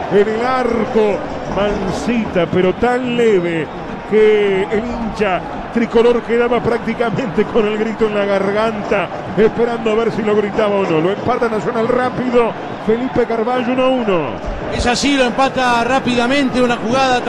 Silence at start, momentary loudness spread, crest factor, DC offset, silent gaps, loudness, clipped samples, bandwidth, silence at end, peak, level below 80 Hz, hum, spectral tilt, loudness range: 0 s; 6 LU; 12 dB; under 0.1%; none; -16 LUFS; under 0.1%; 11 kHz; 0 s; -2 dBFS; -36 dBFS; none; -5.5 dB/octave; 1 LU